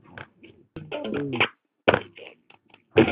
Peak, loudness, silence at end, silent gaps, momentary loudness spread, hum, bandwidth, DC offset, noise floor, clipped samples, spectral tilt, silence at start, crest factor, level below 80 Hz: -2 dBFS; -25 LUFS; 0 s; none; 22 LU; none; 5.2 kHz; under 0.1%; -57 dBFS; under 0.1%; -9.5 dB/octave; 0.15 s; 24 dB; -56 dBFS